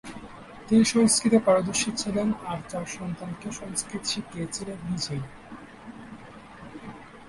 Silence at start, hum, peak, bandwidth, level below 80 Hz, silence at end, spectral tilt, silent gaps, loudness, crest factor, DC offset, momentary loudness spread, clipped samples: 0.05 s; none; -8 dBFS; 11.5 kHz; -56 dBFS; 0 s; -4 dB/octave; none; -26 LUFS; 20 dB; under 0.1%; 24 LU; under 0.1%